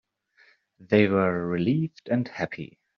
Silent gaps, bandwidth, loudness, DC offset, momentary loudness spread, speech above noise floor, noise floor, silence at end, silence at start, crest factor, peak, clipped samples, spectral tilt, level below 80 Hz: none; 6.6 kHz; -25 LUFS; under 0.1%; 11 LU; 37 dB; -61 dBFS; 0.3 s; 0.8 s; 20 dB; -8 dBFS; under 0.1%; -6.5 dB/octave; -64 dBFS